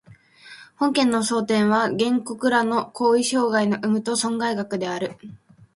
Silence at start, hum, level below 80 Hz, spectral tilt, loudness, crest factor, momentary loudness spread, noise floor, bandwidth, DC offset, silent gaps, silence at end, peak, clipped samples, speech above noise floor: 0.1 s; none; -66 dBFS; -4 dB/octave; -22 LUFS; 18 dB; 7 LU; -48 dBFS; 11.5 kHz; under 0.1%; none; 0.4 s; -4 dBFS; under 0.1%; 27 dB